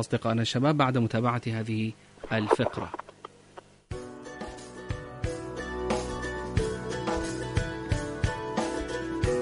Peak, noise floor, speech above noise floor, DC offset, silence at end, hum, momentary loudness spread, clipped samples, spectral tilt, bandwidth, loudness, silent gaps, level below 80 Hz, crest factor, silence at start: -8 dBFS; -52 dBFS; 25 dB; under 0.1%; 0 s; none; 16 LU; under 0.1%; -6 dB/octave; 11 kHz; -30 LUFS; none; -42 dBFS; 22 dB; 0 s